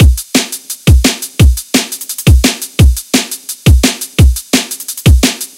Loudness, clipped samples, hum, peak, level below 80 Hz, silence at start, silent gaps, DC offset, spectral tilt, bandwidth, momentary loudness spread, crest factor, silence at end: -11 LUFS; 1%; none; 0 dBFS; -14 dBFS; 0 s; none; under 0.1%; -4.5 dB/octave; 17 kHz; 5 LU; 10 dB; 0.1 s